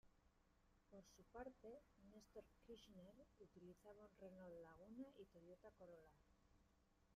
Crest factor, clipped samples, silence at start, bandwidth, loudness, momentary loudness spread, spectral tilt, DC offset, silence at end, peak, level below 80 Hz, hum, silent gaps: 18 dB; under 0.1%; 0.05 s; 11.5 kHz; -64 LUFS; 8 LU; -6 dB/octave; under 0.1%; 0 s; -46 dBFS; -80 dBFS; none; none